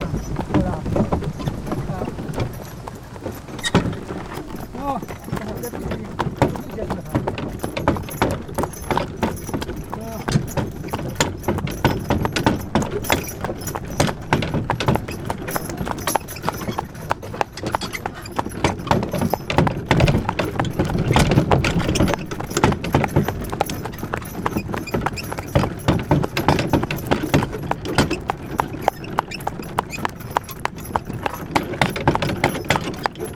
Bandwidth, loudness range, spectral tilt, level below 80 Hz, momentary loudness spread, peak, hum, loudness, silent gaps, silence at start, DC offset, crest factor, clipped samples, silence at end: 18 kHz; 6 LU; -5.5 dB/octave; -36 dBFS; 9 LU; 0 dBFS; none; -23 LUFS; none; 0 s; under 0.1%; 22 dB; under 0.1%; 0 s